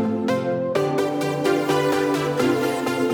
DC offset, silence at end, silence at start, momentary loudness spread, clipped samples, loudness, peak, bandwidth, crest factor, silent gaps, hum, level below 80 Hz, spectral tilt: under 0.1%; 0 s; 0 s; 3 LU; under 0.1%; -22 LUFS; -6 dBFS; over 20 kHz; 14 dB; none; none; -60 dBFS; -5.5 dB/octave